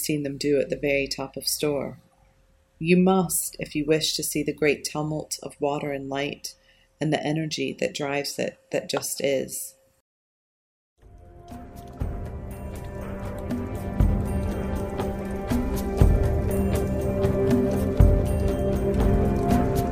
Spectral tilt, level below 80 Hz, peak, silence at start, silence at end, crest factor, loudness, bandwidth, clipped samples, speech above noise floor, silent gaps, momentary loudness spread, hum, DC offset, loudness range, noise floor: -5.5 dB/octave; -32 dBFS; -4 dBFS; 0 s; 0 s; 22 dB; -25 LUFS; 16.5 kHz; under 0.1%; 35 dB; 10.01-10.96 s; 14 LU; none; under 0.1%; 12 LU; -61 dBFS